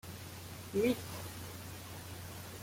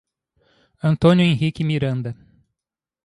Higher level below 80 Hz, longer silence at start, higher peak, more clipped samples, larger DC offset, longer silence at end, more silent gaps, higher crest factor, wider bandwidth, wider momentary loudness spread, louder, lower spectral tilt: second, -64 dBFS vs -50 dBFS; second, 0.05 s vs 0.85 s; second, -20 dBFS vs -2 dBFS; neither; neither; second, 0 s vs 0.9 s; neither; about the same, 20 dB vs 18 dB; first, 16.5 kHz vs 11 kHz; about the same, 14 LU vs 15 LU; second, -40 LUFS vs -19 LUFS; second, -5 dB/octave vs -8 dB/octave